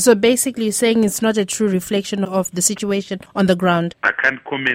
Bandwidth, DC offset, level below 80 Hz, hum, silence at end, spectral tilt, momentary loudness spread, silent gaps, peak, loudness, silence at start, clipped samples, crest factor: 16.5 kHz; under 0.1%; -54 dBFS; none; 0 s; -4 dB/octave; 6 LU; none; 0 dBFS; -18 LUFS; 0 s; under 0.1%; 16 dB